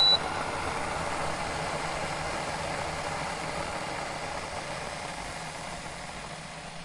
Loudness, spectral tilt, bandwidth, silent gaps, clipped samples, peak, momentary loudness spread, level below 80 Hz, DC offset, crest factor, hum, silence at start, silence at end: -32 LUFS; -2.5 dB/octave; 11.5 kHz; none; under 0.1%; -12 dBFS; 7 LU; -50 dBFS; under 0.1%; 20 dB; none; 0 s; 0 s